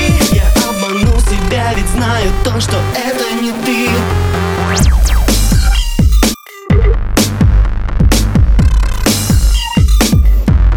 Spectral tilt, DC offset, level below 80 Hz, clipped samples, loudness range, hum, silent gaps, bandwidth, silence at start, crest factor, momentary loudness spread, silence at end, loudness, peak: -5 dB/octave; under 0.1%; -12 dBFS; under 0.1%; 2 LU; none; none; 19.5 kHz; 0 s; 10 dB; 4 LU; 0 s; -12 LUFS; 0 dBFS